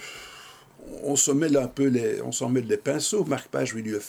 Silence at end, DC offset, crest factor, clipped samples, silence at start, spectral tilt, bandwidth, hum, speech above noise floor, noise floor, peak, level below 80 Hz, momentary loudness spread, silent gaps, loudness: 0 s; under 0.1%; 18 dB; under 0.1%; 0 s; -4 dB/octave; over 20 kHz; none; 23 dB; -48 dBFS; -8 dBFS; -60 dBFS; 19 LU; none; -25 LUFS